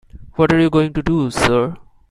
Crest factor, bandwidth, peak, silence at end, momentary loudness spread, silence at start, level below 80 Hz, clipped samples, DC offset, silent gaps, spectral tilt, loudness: 16 dB; 13.5 kHz; 0 dBFS; 0.3 s; 7 LU; 0.15 s; -38 dBFS; under 0.1%; under 0.1%; none; -6 dB/octave; -16 LUFS